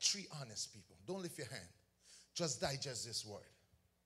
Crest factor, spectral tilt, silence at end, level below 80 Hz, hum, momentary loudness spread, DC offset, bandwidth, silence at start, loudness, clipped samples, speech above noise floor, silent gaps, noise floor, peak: 26 dB; -2.5 dB/octave; 0.5 s; -74 dBFS; none; 17 LU; under 0.1%; 16 kHz; 0 s; -44 LUFS; under 0.1%; 20 dB; none; -66 dBFS; -20 dBFS